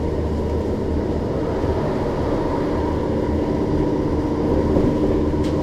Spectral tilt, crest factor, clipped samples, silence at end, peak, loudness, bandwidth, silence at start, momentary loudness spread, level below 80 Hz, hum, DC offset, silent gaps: -8.5 dB/octave; 14 dB; under 0.1%; 0 s; -6 dBFS; -21 LUFS; 11.5 kHz; 0 s; 4 LU; -28 dBFS; none; under 0.1%; none